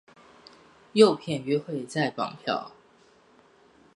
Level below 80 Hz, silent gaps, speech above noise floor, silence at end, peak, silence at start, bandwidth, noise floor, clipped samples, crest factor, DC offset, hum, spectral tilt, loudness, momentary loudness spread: -72 dBFS; none; 34 dB; 1.25 s; -6 dBFS; 0.95 s; 11.5 kHz; -59 dBFS; under 0.1%; 24 dB; under 0.1%; none; -5.5 dB/octave; -26 LUFS; 12 LU